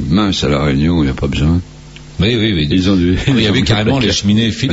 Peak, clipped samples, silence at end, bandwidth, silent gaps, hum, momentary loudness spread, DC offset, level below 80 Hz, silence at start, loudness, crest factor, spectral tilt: -2 dBFS; under 0.1%; 0 s; 8 kHz; none; none; 4 LU; under 0.1%; -28 dBFS; 0 s; -13 LUFS; 12 dB; -5.5 dB/octave